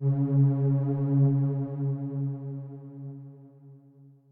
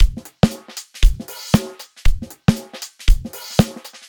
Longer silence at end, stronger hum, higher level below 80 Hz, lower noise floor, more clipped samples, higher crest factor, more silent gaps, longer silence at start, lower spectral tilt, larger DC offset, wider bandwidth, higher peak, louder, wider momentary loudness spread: first, 0.55 s vs 0.35 s; neither; second, -70 dBFS vs -20 dBFS; first, -55 dBFS vs -36 dBFS; neither; about the same, 14 dB vs 16 dB; neither; about the same, 0 s vs 0 s; first, -14 dB/octave vs -5.5 dB/octave; neither; second, 1.9 kHz vs 19.5 kHz; second, -14 dBFS vs 0 dBFS; second, -27 LUFS vs -21 LUFS; first, 19 LU vs 12 LU